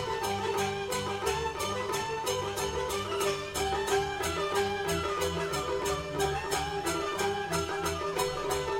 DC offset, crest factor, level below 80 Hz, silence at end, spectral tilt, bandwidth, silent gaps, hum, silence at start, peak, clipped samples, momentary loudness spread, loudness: under 0.1%; 16 dB; -48 dBFS; 0 s; -3.5 dB/octave; 16.5 kHz; none; none; 0 s; -16 dBFS; under 0.1%; 2 LU; -31 LUFS